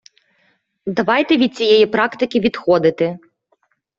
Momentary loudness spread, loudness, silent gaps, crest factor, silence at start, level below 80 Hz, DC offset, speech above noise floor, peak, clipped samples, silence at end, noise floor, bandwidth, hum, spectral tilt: 10 LU; -16 LUFS; none; 16 dB; 0.85 s; -58 dBFS; under 0.1%; 49 dB; -2 dBFS; under 0.1%; 0.8 s; -64 dBFS; 7.6 kHz; none; -6 dB/octave